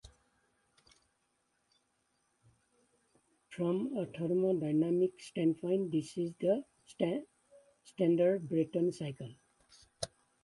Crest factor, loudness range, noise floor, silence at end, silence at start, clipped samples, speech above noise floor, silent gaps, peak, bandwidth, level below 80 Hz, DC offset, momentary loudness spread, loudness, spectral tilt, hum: 18 dB; 7 LU; -79 dBFS; 0.4 s; 0.05 s; under 0.1%; 46 dB; none; -18 dBFS; 11.5 kHz; -74 dBFS; under 0.1%; 14 LU; -34 LUFS; -7 dB/octave; none